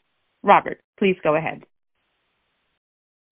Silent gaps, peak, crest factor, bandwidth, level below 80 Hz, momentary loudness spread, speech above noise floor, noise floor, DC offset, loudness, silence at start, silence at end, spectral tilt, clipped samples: 0.84-0.93 s; 0 dBFS; 24 dB; 3.5 kHz; -62 dBFS; 15 LU; 52 dB; -72 dBFS; under 0.1%; -20 LUFS; 0.45 s; 1.7 s; -9.5 dB/octave; under 0.1%